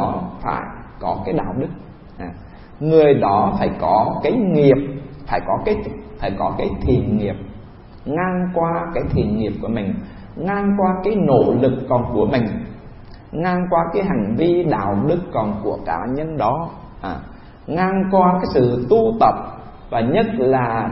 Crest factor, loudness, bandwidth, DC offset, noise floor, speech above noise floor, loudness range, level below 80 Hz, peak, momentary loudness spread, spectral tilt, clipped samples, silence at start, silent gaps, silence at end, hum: 18 dB; -19 LUFS; 5.8 kHz; under 0.1%; -38 dBFS; 21 dB; 5 LU; -38 dBFS; 0 dBFS; 16 LU; -12.5 dB/octave; under 0.1%; 0 s; none; 0 s; none